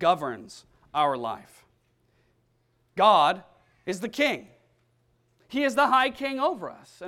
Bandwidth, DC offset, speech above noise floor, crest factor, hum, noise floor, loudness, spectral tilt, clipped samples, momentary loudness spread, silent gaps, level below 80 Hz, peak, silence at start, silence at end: 16 kHz; under 0.1%; 44 dB; 22 dB; none; -69 dBFS; -25 LUFS; -4 dB/octave; under 0.1%; 19 LU; none; -66 dBFS; -6 dBFS; 0 s; 0 s